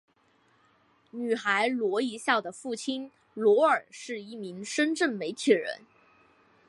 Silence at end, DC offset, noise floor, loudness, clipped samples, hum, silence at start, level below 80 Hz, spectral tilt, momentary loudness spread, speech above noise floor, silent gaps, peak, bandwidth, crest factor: 0.9 s; under 0.1%; -66 dBFS; -28 LUFS; under 0.1%; none; 1.15 s; -82 dBFS; -3.5 dB/octave; 15 LU; 39 dB; none; -8 dBFS; 11.5 kHz; 20 dB